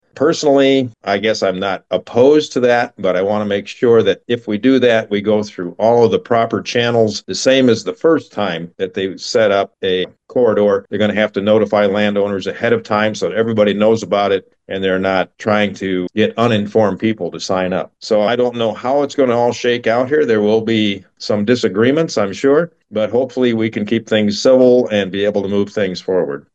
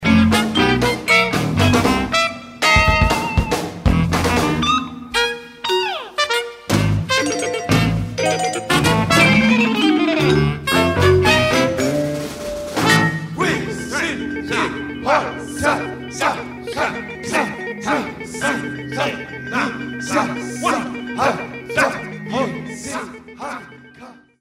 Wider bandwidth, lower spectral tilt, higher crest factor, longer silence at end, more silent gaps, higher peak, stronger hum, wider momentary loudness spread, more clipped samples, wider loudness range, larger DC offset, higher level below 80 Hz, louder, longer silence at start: second, 8.4 kHz vs 16 kHz; about the same, -5.5 dB/octave vs -4.5 dB/octave; about the same, 14 dB vs 18 dB; about the same, 0.15 s vs 0.25 s; neither; about the same, 0 dBFS vs 0 dBFS; neither; second, 8 LU vs 12 LU; neither; second, 2 LU vs 7 LU; neither; second, -62 dBFS vs -34 dBFS; first, -15 LUFS vs -18 LUFS; first, 0.15 s vs 0 s